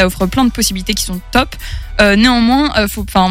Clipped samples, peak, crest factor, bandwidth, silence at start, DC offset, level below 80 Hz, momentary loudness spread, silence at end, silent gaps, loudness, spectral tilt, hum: under 0.1%; 0 dBFS; 12 dB; 16.5 kHz; 0 s; under 0.1%; -26 dBFS; 9 LU; 0 s; none; -13 LUFS; -4 dB/octave; none